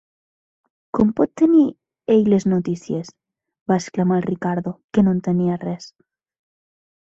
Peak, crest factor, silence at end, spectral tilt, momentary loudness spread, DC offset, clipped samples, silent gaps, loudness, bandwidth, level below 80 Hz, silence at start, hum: -4 dBFS; 18 dB; 1.15 s; -8 dB/octave; 13 LU; under 0.1%; under 0.1%; 3.61-3.66 s, 4.84-4.89 s; -20 LUFS; 7.8 kHz; -56 dBFS; 0.95 s; none